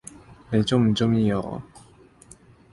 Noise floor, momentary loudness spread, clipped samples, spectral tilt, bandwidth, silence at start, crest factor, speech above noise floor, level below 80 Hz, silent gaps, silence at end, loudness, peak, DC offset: -52 dBFS; 16 LU; under 0.1%; -6.5 dB/octave; 11.5 kHz; 0.3 s; 16 dB; 30 dB; -52 dBFS; none; 1.1 s; -23 LUFS; -8 dBFS; under 0.1%